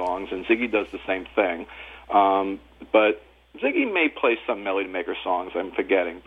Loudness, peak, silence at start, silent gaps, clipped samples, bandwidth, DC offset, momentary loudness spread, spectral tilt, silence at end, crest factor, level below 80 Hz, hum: -24 LUFS; -6 dBFS; 0 s; none; under 0.1%; 5.8 kHz; under 0.1%; 10 LU; -6 dB/octave; 0.05 s; 18 dB; -56 dBFS; none